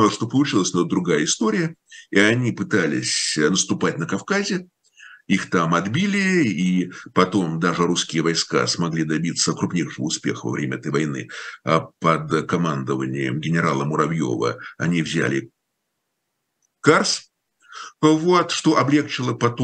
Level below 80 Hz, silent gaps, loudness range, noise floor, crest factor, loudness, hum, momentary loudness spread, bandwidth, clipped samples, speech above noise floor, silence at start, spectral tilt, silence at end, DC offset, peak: -62 dBFS; none; 3 LU; -76 dBFS; 20 dB; -21 LUFS; none; 7 LU; 10 kHz; under 0.1%; 56 dB; 0 s; -4.5 dB/octave; 0 s; under 0.1%; 0 dBFS